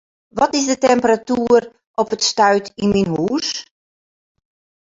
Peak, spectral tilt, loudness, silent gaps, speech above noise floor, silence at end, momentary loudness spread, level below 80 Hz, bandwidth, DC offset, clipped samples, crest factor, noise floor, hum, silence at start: -2 dBFS; -4 dB/octave; -17 LUFS; 1.87-1.94 s; over 74 dB; 1.35 s; 9 LU; -52 dBFS; 7.8 kHz; under 0.1%; under 0.1%; 16 dB; under -90 dBFS; none; 0.35 s